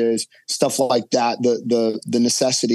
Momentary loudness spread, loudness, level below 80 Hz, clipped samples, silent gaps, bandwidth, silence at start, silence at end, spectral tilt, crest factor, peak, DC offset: 4 LU; -20 LUFS; -74 dBFS; under 0.1%; none; 12.5 kHz; 0 s; 0 s; -3.5 dB/octave; 16 dB; -2 dBFS; under 0.1%